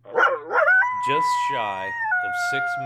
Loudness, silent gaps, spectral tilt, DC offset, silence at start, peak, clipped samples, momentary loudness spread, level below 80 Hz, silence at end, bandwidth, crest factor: -21 LUFS; none; -3 dB/octave; under 0.1%; 0.05 s; -6 dBFS; under 0.1%; 8 LU; -70 dBFS; 0 s; 15 kHz; 16 dB